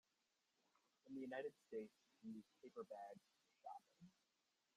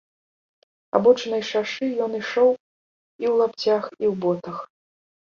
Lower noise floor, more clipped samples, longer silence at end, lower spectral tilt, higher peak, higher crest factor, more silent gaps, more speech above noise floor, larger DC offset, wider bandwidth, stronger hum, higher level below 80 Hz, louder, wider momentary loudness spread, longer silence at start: about the same, -88 dBFS vs under -90 dBFS; neither; about the same, 0.65 s vs 0.75 s; about the same, -6 dB/octave vs -5.5 dB/octave; second, -38 dBFS vs -4 dBFS; about the same, 20 dB vs 20 dB; second, none vs 2.60-3.19 s; second, 32 dB vs over 69 dB; neither; first, 11.5 kHz vs 7.2 kHz; neither; second, under -90 dBFS vs -68 dBFS; second, -57 LUFS vs -22 LUFS; about the same, 11 LU vs 10 LU; about the same, 1.05 s vs 0.95 s